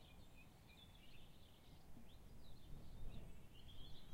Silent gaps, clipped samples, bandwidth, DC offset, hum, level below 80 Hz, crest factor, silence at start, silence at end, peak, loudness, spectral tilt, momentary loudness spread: none; under 0.1%; 16 kHz; under 0.1%; none; -60 dBFS; 16 dB; 0 s; 0 s; -40 dBFS; -63 LUFS; -5 dB/octave; 7 LU